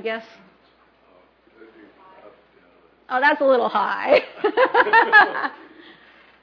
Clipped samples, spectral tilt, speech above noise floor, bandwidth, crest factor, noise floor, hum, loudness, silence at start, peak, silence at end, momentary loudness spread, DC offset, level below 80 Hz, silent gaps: under 0.1%; -5 dB/octave; 39 dB; 5.4 kHz; 20 dB; -57 dBFS; none; -18 LUFS; 0.05 s; -2 dBFS; 0.9 s; 15 LU; under 0.1%; -70 dBFS; none